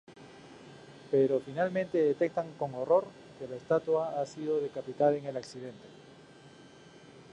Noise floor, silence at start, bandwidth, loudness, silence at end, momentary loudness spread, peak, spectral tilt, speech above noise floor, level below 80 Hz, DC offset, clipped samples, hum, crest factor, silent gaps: -54 dBFS; 0.1 s; 9.8 kHz; -31 LUFS; 0.1 s; 23 LU; -14 dBFS; -7 dB/octave; 24 dB; -74 dBFS; under 0.1%; under 0.1%; none; 18 dB; none